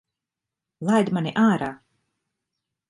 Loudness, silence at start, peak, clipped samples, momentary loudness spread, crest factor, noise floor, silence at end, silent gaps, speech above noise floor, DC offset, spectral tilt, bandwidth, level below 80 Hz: -22 LUFS; 0.8 s; -8 dBFS; under 0.1%; 10 LU; 18 dB; -87 dBFS; 1.15 s; none; 66 dB; under 0.1%; -6.5 dB/octave; 11.5 kHz; -66 dBFS